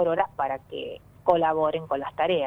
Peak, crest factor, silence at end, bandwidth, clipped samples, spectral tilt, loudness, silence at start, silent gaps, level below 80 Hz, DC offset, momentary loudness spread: -6 dBFS; 18 dB; 0 s; 5.2 kHz; under 0.1%; -7.5 dB/octave; -26 LUFS; 0 s; none; -60 dBFS; under 0.1%; 14 LU